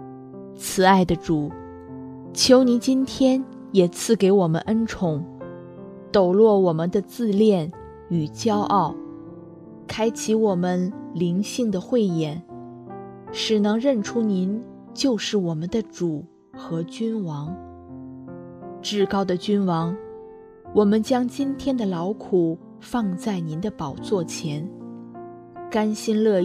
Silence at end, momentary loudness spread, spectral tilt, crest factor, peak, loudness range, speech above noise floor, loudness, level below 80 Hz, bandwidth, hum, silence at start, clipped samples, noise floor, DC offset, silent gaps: 0 s; 21 LU; -5.5 dB/octave; 22 dB; -2 dBFS; 7 LU; 22 dB; -22 LUFS; -54 dBFS; 14 kHz; none; 0 s; under 0.1%; -43 dBFS; under 0.1%; none